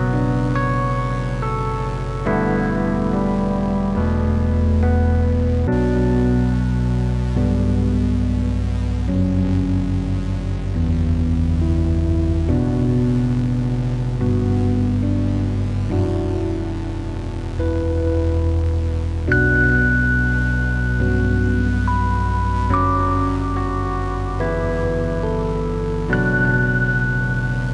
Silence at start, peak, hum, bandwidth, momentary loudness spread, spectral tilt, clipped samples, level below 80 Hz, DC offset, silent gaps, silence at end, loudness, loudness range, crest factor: 0 s; -4 dBFS; none; 10 kHz; 6 LU; -8.5 dB/octave; under 0.1%; -26 dBFS; under 0.1%; none; 0 s; -20 LUFS; 3 LU; 14 dB